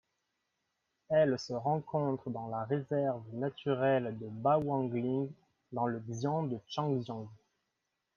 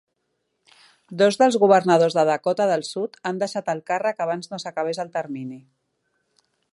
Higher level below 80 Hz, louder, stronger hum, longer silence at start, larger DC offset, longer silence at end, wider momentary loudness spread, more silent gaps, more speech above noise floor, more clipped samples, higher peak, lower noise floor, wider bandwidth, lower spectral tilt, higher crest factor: about the same, -74 dBFS vs -76 dBFS; second, -34 LUFS vs -21 LUFS; neither; about the same, 1.1 s vs 1.1 s; neither; second, 0.8 s vs 1.15 s; second, 9 LU vs 13 LU; neither; about the same, 51 dB vs 53 dB; neither; second, -16 dBFS vs -2 dBFS; first, -85 dBFS vs -75 dBFS; second, 7.4 kHz vs 11.5 kHz; first, -7.5 dB/octave vs -5 dB/octave; about the same, 18 dB vs 20 dB